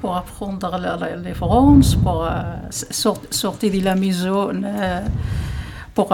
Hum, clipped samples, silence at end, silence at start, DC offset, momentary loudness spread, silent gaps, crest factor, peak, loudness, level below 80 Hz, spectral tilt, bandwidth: none; under 0.1%; 0 s; 0 s; under 0.1%; 13 LU; none; 18 dB; 0 dBFS; -20 LUFS; -30 dBFS; -5.5 dB/octave; 17 kHz